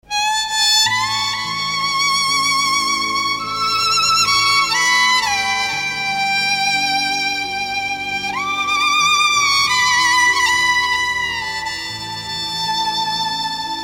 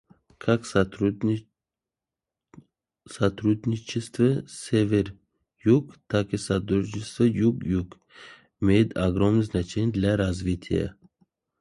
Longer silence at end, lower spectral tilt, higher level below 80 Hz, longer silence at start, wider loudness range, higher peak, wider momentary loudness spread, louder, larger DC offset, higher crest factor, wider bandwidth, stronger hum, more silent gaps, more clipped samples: second, 0 s vs 0.7 s; second, 0.5 dB/octave vs -7 dB/octave; about the same, -50 dBFS vs -46 dBFS; second, 0.1 s vs 0.45 s; about the same, 4 LU vs 4 LU; first, -4 dBFS vs -8 dBFS; about the same, 8 LU vs 8 LU; first, -15 LUFS vs -25 LUFS; neither; about the same, 14 dB vs 18 dB; first, 16.5 kHz vs 11.5 kHz; neither; neither; neither